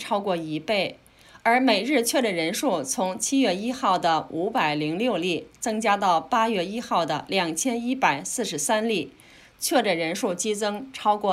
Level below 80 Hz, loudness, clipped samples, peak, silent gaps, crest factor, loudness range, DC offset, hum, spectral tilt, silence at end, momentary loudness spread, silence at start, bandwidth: -64 dBFS; -24 LUFS; under 0.1%; -8 dBFS; none; 18 dB; 2 LU; under 0.1%; none; -3 dB/octave; 0 s; 6 LU; 0 s; 16 kHz